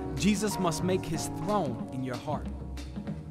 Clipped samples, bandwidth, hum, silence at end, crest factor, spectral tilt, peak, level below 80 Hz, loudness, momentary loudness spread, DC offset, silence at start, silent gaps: under 0.1%; 16 kHz; none; 0 s; 18 dB; -5.5 dB/octave; -14 dBFS; -44 dBFS; -32 LUFS; 11 LU; under 0.1%; 0 s; none